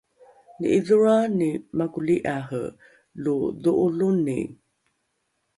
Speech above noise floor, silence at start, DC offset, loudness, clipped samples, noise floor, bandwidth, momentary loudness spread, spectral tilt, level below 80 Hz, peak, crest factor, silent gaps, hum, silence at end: 52 dB; 0.6 s; under 0.1%; -23 LUFS; under 0.1%; -74 dBFS; 11.5 kHz; 13 LU; -7.5 dB/octave; -60 dBFS; -8 dBFS; 16 dB; none; none; 1.05 s